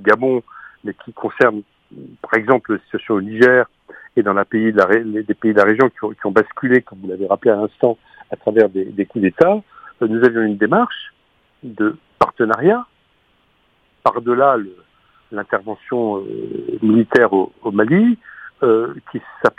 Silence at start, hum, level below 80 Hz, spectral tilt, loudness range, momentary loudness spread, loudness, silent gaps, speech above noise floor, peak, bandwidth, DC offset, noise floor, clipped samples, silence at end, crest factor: 0 s; none; -60 dBFS; -8 dB/octave; 4 LU; 16 LU; -17 LUFS; none; 43 dB; 0 dBFS; 8.2 kHz; under 0.1%; -59 dBFS; under 0.1%; 0.1 s; 18 dB